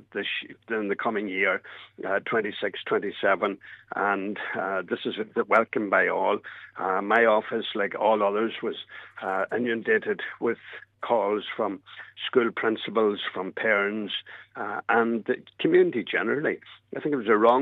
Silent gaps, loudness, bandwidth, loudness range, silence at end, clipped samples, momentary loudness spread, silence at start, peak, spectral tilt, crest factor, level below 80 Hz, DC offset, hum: none; -26 LUFS; 4.6 kHz; 4 LU; 0 s; under 0.1%; 12 LU; 0.15 s; -6 dBFS; -7 dB/octave; 20 dB; -78 dBFS; under 0.1%; none